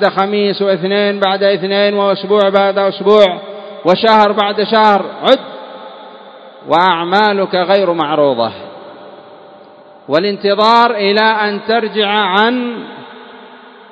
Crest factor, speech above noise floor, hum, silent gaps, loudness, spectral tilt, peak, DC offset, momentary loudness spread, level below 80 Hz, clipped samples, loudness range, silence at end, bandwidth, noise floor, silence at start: 14 dB; 27 dB; none; none; -12 LUFS; -6 dB/octave; 0 dBFS; under 0.1%; 19 LU; -64 dBFS; 0.3%; 3 LU; 0.35 s; 8 kHz; -39 dBFS; 0 s